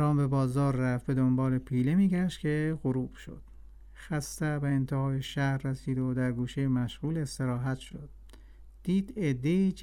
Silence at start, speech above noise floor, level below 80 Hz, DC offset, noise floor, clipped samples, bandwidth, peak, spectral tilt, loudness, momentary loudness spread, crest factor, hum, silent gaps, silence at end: 0 s; 21 dB; -50 dBFS; under 0.1%; -50 dBFS; under 0.1%; 14.5 kHz; -18 dBFS; -7.5 dB/octave; -30 LUFS; 10 LU; 12 dB; none; none; 0 s